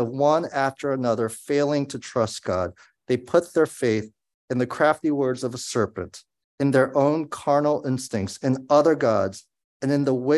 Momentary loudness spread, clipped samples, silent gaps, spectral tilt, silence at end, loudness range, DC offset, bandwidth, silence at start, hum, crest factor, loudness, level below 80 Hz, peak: 9 LU; under 0.1%; 4.34-4.48 s, 6.44-6.58 s, 9.64-9.80 s; -6 dB/octave; 0 s; 3 LU; under 0.1%; 12.5 kHz; 0 s; none; 18 dB; -23 LUFS; -56 dBFS; -6 dBFS